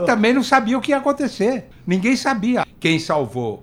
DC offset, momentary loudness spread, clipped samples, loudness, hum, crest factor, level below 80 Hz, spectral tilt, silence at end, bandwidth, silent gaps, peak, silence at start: under 0.1%; 6 LU; under 0.1%; -19 LUFS; none; 18 dB; -52 dBFS; -5 dB/octave; 0.05 s; 15.5 kHz; none; 0 dBFS; 0 s